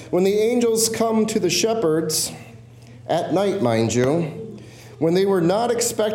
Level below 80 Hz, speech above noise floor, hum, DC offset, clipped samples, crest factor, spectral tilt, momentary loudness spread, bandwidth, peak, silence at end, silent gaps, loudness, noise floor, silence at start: -58 dBFS; 23 dB; none; under 0.1%; under 0.1%; 14 dB; -4.5 dB/octave; 10 LU; 17 kHz; -6 dBFS; 0 s; none; -20 LUFS; -43 dBFS; 0 s